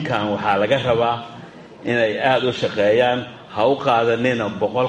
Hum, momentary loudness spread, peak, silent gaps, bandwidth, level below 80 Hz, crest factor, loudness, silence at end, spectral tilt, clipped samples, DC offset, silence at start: none; 10 LU; -4 dBFS; none; 10.5 kHz; -56 dBFS; 16 dB; -19 LUFS; 0 s; -6 dB/octave; under 0.1%; under 0.1%; 0 s